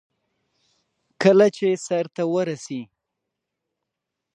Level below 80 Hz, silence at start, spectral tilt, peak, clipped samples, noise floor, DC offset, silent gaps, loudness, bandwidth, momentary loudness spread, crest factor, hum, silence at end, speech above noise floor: -76 dBFS; 1.2 s; -6 dB/octave; -2 dBFS; under 0.1%; -83 dBFS; under 0.1%; none; -21 LUFS; 9.8 kHz; 16 LU; 22 dB; none; 1.5 s; 63 dB